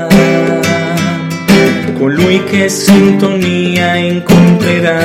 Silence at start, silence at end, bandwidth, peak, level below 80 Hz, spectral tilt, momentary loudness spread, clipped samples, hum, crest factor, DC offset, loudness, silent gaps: 0 s; 0 s; 16.5 kHz; 0 dBFS; -38 dBFS; -5.5 dB/octave; 6 LU; 0.6%; none; 8 dB; under 0.1%; -9 LUFS; none